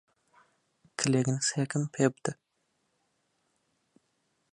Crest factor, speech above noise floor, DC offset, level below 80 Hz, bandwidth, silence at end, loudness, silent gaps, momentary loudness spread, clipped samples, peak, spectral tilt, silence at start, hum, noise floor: 24 dB; 48 dB; under 0.1%; -72 dBFS; 11 kHz; 2.2 s; -30 LUFS; none; 12 LU; under 0.1%; -10 dBFS; -4.5 dB/octave; 1 s; none; -77 dBFS